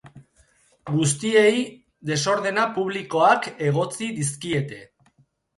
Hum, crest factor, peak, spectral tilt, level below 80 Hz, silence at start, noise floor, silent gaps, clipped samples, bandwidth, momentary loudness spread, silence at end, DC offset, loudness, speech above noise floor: none; 18 dB; -6 dBFS; -4.5 dB/octave; -64 dBFS; 0.05 s; -62 dBFS; none; under 0.1%; 11.5 kHz; 15 LU; 0.75 s; under 0.1%; -22 LUFS; 40 dB